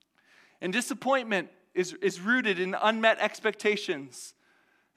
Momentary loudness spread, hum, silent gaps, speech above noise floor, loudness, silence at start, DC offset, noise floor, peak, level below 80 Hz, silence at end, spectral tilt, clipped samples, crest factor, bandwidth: 12 LU; none; none; 39 dB; -28 LUFS; 0.6 s; under 0.1%; -67 dBFS; -8 dBFS; -84 dBFS; 0.65 s; -3.5 dB/octave; under 0.1%; 22 dB; 15.5 kHz